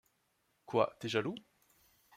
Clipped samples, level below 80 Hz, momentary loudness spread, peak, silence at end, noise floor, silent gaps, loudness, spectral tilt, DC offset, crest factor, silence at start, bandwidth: under 0.1%; -80 dBFS; 10 LU; -16 dBFS; 0.75 s; -78 dBFS; none; -36 LUFS; -5.5 dB/octave; under 0.1%; 24 dB; 0.7 s; 16 kHz